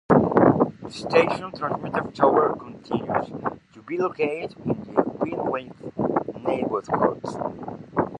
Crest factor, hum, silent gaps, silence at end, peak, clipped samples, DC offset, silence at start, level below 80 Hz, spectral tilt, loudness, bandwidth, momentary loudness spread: 22 dB; none; none; 0 s; -2 dBFS; under 0.1%; under 0.1%; 0.1 s; -54 dBFS; -7.5 dB/octave; -24 LUFS; 10.5 kHz; 13 LU